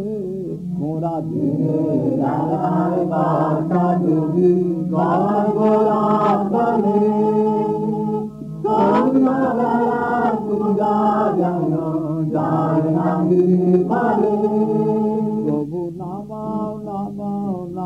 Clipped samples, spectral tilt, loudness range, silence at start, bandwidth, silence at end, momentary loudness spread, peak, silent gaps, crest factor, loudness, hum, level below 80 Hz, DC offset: under 0.1%; -10 dB/octave; 3 LU; 0 s; 8 kHz; 0 s; 10 LU; -4 dBFS; none; 14 dB; -19 LUFS; none; -54 dBFS; under 0.1%